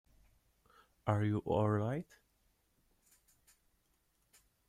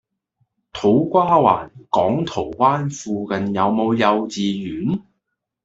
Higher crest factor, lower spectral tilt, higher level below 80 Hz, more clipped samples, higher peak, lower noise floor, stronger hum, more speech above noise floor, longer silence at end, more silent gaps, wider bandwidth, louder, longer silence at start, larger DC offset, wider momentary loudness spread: about the same, 22 dB vs 18 dB; first, -8.5 dB/octave vs -6.5 dB/octave; second, -68 dBFS vs -54 dBFS; neither; second, -18 dBFS vs -2 dBFS; about the same, -77 dBFS vs -77 dBFS; neither; second, 43 dB vs 59 dB; first, 2.65 s vs 0.65 s; neither; first, 10.5 kHz vs 8 kHz; second, -36 LUFS vs -19 LUFS; first, 1.05 s vs 0.75 s; neither; about the same, 10 LU vs 9 LU